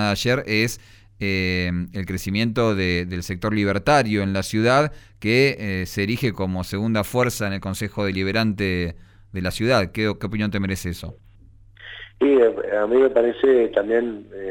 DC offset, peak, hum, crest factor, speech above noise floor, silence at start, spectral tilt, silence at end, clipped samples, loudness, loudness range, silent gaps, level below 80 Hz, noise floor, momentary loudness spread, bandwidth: under 0.1%; -6 dBFS; none; 16 dB; 27 dB; 0 s; -5.5 dB/octave; 0 s; under 0.1%; -21 LUFS; 4 LU; none; -44 dBFS; -49 dBFS; 11 LU; over 20 kHz